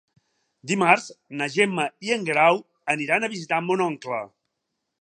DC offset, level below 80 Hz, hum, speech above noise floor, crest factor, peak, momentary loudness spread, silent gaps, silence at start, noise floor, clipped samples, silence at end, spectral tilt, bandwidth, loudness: under 0.1%; -78 dBFS; none; 57 dB; 24 dB; -2 dBFS; 12 LU; none; 0.65 s; -80 dBFS; under 0.1%; 0.75 s; -4.5 dB/octave; 10 kHz; -23 LUFS